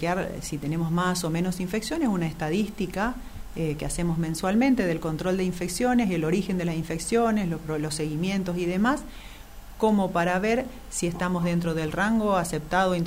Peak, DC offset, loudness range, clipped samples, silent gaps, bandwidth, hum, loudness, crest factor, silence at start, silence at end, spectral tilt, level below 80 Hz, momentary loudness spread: -10 dBFS; under 0.1%; 2 LU; under 0.1%; none; 16 kHz; none; -26 LUFS; 16 dB; 0 s; 0 s; -5.5 dB/octave; -44 dBFS; 7 LU